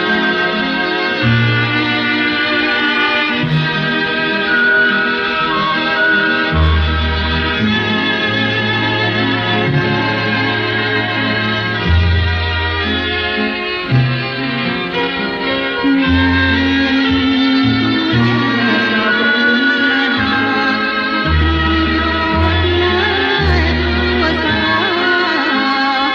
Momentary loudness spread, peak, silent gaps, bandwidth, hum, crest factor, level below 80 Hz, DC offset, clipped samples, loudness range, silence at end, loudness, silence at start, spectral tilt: 4 LU; -2 dBFS; none; 6.8 kHz; none; 12 dB; -26 dBFS; under 0.1%; under 0.1%; 2 LU; 0 s; -14 LUFS; 0 s; -6.5 dB/octave